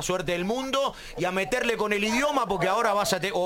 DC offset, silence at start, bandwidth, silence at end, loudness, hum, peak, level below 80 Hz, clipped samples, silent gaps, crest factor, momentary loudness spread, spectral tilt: under 0.1%; 0 s; 17 kHz; 0 s; -26 LUFS; none; -10 dBFS; -50 dBFS; under 0.1%; none; 16 dB; 4 LU; -3.5 dB/octave